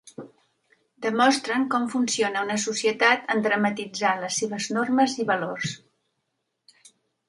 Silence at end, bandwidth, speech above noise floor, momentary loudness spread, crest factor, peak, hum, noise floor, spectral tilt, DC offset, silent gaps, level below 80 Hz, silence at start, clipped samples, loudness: 1.5 s; 11.5 kHz; 54 dB; 10 LU; 22 dB; -4 dBFS; none; -78 dBFS; -3 dB/octave; under 0.1%; none; -72 dBFS; 0.05 s; under 0.1%; -24 LUFS